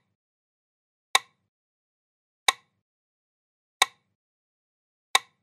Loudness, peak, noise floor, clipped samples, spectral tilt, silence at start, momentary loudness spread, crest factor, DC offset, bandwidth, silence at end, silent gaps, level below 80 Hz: -26 LUFS; 0 dBFS; under -90 dBFS; under 0.1%; 3.5 dB/octave; 1.15 s; 0 LU; 32 dB; under 0.1%; 13.5 kHz; 0.25 s; 1.48-2.46 s, 2.82-3.80 s, 4.15-5.14 s; under -90 dBFS